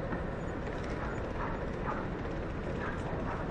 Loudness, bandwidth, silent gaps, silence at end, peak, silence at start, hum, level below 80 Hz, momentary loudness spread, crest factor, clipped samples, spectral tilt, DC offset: -37 LUFS; 9.6 kHz; none; 0 s; -24 dBFS; 0 s; none; -42 dBFS; 2 LU; 12 dB; under 0.1%; -7.5 dB/octave; under 0.1%